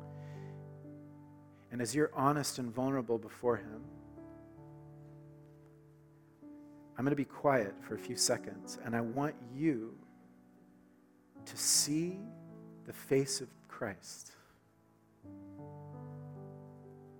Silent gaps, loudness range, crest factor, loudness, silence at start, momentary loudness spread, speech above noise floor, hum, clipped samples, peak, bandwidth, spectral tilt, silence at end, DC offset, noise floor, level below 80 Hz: none; 11 LU; 24 dB; -35 LUFS; 0 s; 23 LU; 32 dB; none; under 0.1%; -14 dBFS; 18 kHz; -4 dB/octave; 0 s; under 0.1%; -67 dBFS; -76 dBFS